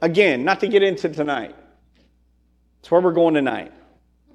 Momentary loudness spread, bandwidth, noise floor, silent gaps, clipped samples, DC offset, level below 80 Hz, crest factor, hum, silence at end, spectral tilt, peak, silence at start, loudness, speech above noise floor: 13 LU; 9.8 kHz; -60 dBFS; none; under 0.1%; under 0.1%; -60 dBFS; 18 dB; none; 0.65 s; -6.5 dB/octave; -2 dBFS; 0 s; -19 LUFS; 42 dB